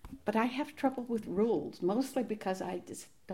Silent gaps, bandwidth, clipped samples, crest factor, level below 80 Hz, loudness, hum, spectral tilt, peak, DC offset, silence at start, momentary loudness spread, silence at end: none; 16 kHz; under 0.1%; 18 dB; -64 dBFS; -34 LUFS; none; -6 dB/octave; -16 dBFS; under 0.1%; 0.05 s; 8 LU; 0 s